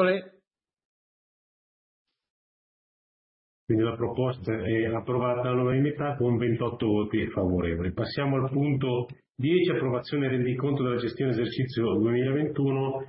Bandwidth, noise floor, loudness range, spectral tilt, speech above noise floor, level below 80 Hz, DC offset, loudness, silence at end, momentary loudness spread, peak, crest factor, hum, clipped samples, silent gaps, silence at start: 5.8 kHz; -73 dBFS; 6 LU; -11.5 dB/octave; 47 dB; -54 dBFS; under 0.1%; -27 LUFS; 0 s; 4 LU; -12 dBFS; 16 dB; none; under 0.1%; 0.85-2.05 s, 2.30-3.67 s, 9.31-9.35 s; 0 s